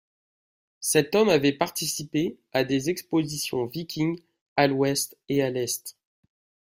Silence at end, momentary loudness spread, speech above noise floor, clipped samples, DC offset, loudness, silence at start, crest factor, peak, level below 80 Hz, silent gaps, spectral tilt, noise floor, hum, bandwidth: 0.9 s; 10 LU; over 65 dB; under 0.1%; under 0.1%; -25 LUFS; 0.8 s; 20 dB; -6 dBFS; -64 dBFS; 4.41-4.56 s; -4 dB/octave; under -90 dBFS; none; 16 kHz